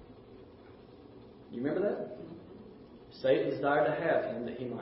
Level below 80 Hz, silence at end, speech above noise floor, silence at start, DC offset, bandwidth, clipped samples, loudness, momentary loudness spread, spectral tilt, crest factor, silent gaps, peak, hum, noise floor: -66 dBFS; 0 s; 22 dB; 0 s; under 0.1%; 5.6 kHz; under 0.1%; -32 LUFS; 25 LU; -5 dB/octave; 18 dB; none; -16 dBFS; none; -54 dBFS